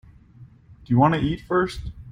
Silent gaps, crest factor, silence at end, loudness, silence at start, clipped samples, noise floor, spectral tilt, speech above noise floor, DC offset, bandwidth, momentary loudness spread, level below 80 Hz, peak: none; 20 dB; 0 s; -22 LUFS; 0.4 s; under 0.1%; -49 dBFS; -8 dB/octave; 27 dB; under 0.1%; 11.5 kHz; 9 LU; -42 dBFS; -4 dBFS